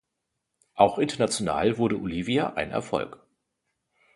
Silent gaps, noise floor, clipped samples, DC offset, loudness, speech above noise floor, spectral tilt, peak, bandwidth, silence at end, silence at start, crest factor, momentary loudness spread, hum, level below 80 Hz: none; -81 dBFS; under 0.1%; under 0.1%; -26 LUFS; 56 dB; -5 dB/octave; -4 dBFS; 11.5 kHz; 1.05 s; 0.75 s; 24 dB; 9 LU; none; -56 dBFS